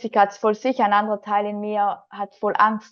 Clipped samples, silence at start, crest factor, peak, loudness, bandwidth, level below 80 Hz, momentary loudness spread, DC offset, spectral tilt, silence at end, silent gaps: under 0.1%; 0 s; 18 dB; -4 dBFS; -21 LUFS; 7 kHz; -76 dBFS; 7 LU; under 0.1%; -5.5 dB/octave; 0.1 s; none